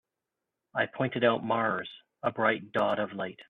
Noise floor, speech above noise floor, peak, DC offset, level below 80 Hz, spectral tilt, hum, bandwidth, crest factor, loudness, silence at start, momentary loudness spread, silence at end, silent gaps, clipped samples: -87 dBFS; 58 dB; -12 dBFS; under 0.1%; -72 dBFS; -7.5 dB/octave; none; 5.6 kHz; 20 dB; -30 LUFS; 0.75 s; 9 LU; 0.05 s; none; under 0.1%